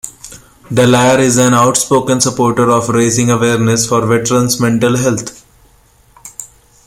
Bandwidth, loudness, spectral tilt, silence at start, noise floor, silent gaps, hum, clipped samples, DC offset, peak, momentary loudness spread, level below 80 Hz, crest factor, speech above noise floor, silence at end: 16.5 kHz; -11 LUFS; -4.5 dB/octave; 0.05 s; -48 dBFS; none; none; under 0.1%; under 0.1%; 0 dBFS; 16 LU; -44 dBFS; 12 dB; 37 dB; 0.4 s